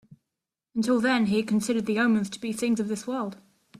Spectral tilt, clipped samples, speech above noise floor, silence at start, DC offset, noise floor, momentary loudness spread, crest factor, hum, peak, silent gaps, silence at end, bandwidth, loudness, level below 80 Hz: -5 dB/octave; under 0.1%; 62 dB; 0.75 s; under 0.1%; -87 dBFS; 9 LU; 18 dB; none; -10 dBFS; none; 0.45 s; 14 kHz; -26 LUFS; -66 dBFS